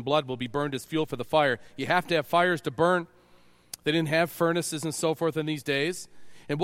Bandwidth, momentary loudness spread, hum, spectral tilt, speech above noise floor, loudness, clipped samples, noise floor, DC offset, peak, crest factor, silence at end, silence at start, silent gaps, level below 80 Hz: 16.5 kHz; 8 LU; none; -4.5 dB/octave; 31 dB; -27 LUFS; under 0.1%; -57 dBFS; under 0.1%; -8 dBFS; 20 dB; 0 s; 0 s; none; -64 dBFS